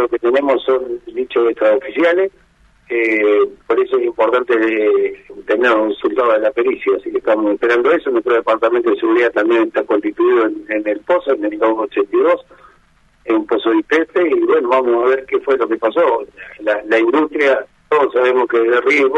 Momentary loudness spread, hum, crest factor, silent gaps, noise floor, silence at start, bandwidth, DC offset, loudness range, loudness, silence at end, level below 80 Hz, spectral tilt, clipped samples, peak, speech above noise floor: 6 LU; none; 14 dB; none; -53 dBFS; 0 s; 7.4 kHz; under 0.1%; 2 LU; -15 LUFS; 0 s; -56 dBFS; -5 dB/octave; under 0.1%; -2 dBFS; 38 dB